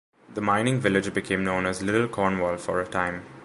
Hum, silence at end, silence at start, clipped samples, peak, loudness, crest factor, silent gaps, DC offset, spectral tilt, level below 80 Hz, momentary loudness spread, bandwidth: none; 0 s; 0.3 s; under 0.1%; -6 dBFS; -25 LUFS; 20 dB; none; under 0.1%; -5.5 dB/octave; -52 dBFS; 5 LU; 11.5 kHz